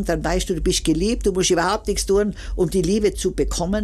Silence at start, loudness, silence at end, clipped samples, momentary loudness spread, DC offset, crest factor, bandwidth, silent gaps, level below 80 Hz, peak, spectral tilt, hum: 0 s; -21 LUFS; 0 s; under 0.1%; 4 LU; under 0.1%; 12 dB; 14.5 kHz; none; -30 dBFS; -8 dBFS; -4.5 dB/octave; none